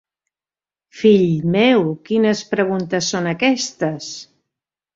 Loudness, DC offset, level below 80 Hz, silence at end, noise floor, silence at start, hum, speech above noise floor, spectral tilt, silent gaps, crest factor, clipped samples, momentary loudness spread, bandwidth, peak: -17 LUFS; under 0.1%; -58 dBFS; 0.7 s; under -90 dBFS; 0.95 s; none; over 73 dB; -5 dB/octave; none; 16 dB; under 0.1%; 9 LU; 7.8 kHz; -2 dBFS